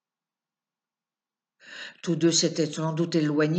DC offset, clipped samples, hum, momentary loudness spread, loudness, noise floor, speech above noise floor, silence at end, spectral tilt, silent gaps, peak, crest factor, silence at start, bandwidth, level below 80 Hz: under 0.1%; under 0.1%; none; 19 LU; -25 LUFS; under -90 dBFS; over 65 dB; 0 s; -4.5 dB/octave; none; -10 dBFS; 18 dB; 1.65 s; 9 kHz; -80 dBFS